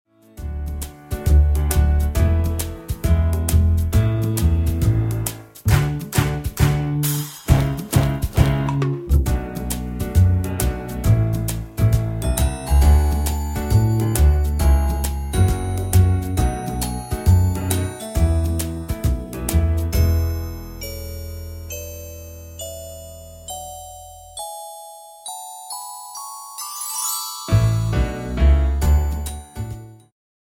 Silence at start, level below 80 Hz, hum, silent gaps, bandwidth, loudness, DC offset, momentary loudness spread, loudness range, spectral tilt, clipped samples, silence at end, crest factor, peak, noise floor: 0.35 s; -22 dBFS; none; none; 17 kHz; -20 LUFS; under 0.1%; 15 LU; 14 LU; -6 dB/octave; under 0.1%; 0.55 s; 18 dB; 0 dBFS; -40 dBFS